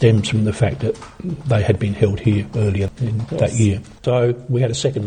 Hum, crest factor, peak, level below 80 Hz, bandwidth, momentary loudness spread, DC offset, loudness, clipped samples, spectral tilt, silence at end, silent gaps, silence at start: none; 16 dB; 0 dBFS; -42 dBFS; 9.8 kHz; 7 LU; under 0.1%; -19 LUFS; under 0.1%; -6.5 dB/octave; 0 s; none; 0 s